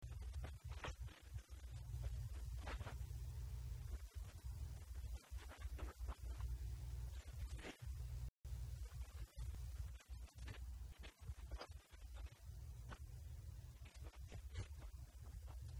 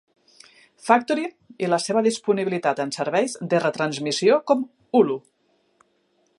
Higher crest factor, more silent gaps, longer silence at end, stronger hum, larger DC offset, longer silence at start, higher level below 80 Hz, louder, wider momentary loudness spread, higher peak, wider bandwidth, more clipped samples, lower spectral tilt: second, 14 dB vs 22 dB; first, 8.29-8.34 s vs none; second, 0 s vs 1.2 s; neither; neither; second, 0 s vs 0.85 s; first, -52 dBFS vs -76 dBFS; second, -54 LUFS vs -22 LUFS; about the same, 7 LU vs 7 LU; second, -36 dBFS vs -2 dBFS; first, 19.5 kHz vs 11.5 kHz; neither; about the same, -5 dB/octave vs -4.5 dB/octave